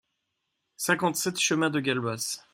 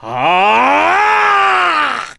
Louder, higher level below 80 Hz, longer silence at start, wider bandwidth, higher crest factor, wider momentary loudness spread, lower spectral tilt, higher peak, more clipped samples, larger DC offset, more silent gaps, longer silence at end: second, -27 LUFS vs -11 LUFS; second, -72 dBFS vs -56 dBFS; first, 0.8 s vs 0 s; first, 16.5 kHz vs 11.5 kHz; first, 22 dB vs 10 dB; first, 7 LU vs 3 LU; about the same, -3 dB/octave vs -3 dB/octave; second, -8 dBFS vs -2 dBFS; neither; second, under 0.1% vs 0.2%; neither; about the same, 0.15 s vs 0.05 s